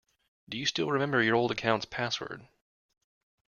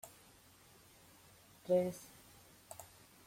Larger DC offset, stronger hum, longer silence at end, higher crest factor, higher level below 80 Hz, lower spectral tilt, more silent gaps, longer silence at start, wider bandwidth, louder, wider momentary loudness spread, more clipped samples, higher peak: neither; neither; first, 1.05 s vs 0.4 s; about the same, 22 dB vs 22 dB; first, -66 dBFS vs -76 dBFS; second, -4.5 dB/octave vs -6 dB/octave; neither; first, 0.5 s vs 0.05 s; second, 7.2 kHz vs 16.5 kHz; first, -29 LUFS vs -37 LUFS; second, 14 LU vs 27 LU; neither; first, -10 dBFS vs -22 dBFS